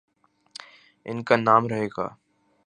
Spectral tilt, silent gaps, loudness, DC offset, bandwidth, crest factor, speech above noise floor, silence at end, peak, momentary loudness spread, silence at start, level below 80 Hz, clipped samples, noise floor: -6.5 dB/octave; none; -23 LUFS; under 0.1%; 10 kHz; 24 dB; 27 dB; 0.55 s; -2 dBFS; 24 LU; 1.05 s; -66 dBFS; under 0.1%; -49 dBFS